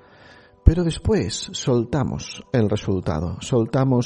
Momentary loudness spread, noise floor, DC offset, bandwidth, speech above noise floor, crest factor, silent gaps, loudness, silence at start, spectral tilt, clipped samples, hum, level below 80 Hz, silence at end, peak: 7 LU; -49 dBFS; under 0.1%; 10.5 kHz; 27 dB; 20 dB; none; -22 LUFS; 0.65 s; -6.5 dB/octave; under 0.1%; none; -28 dBFS; 0 s; 0 dBFS